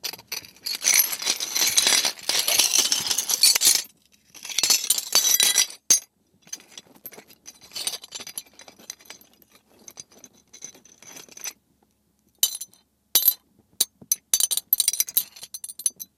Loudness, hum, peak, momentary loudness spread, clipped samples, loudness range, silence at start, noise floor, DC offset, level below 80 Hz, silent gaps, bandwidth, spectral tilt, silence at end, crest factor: -20 LUFS; none; 0 dBFS; 24 LU; under 0.1%; 22 LU; 0.05 s; -67 dBFS; under 0.1%; -70 dBFS; none; 16.5 kHz; 2.5 dB/octave; 0.15 s; 26 dB